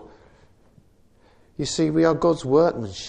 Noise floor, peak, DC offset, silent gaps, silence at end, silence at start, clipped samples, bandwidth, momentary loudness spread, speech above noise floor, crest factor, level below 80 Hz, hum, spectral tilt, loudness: -56 dBFS; -6 dBFS; under 0.1%; none; 0 s; 0 s; under 0.1%; 9.8 kHz; 11 LU; 36 dB; 18 dB; -52 dBFS; none; -5.5 dB/octave; -21 LUFS